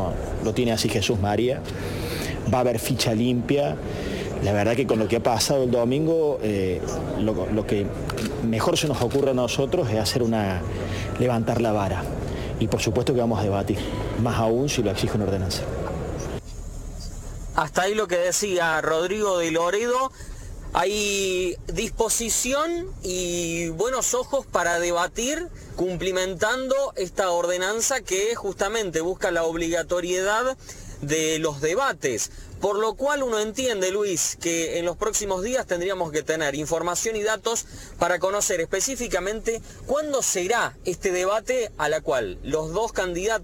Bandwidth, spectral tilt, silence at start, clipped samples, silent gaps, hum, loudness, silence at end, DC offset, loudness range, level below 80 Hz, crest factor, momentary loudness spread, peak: 17 kHz; -4 dB/octave; 0 s; under 0.1%; none; none; -24 LUFS; 0 s; under 0.1%; 2 LU; -40 dBFS; 20 dB; 7 LU; -4 dBFS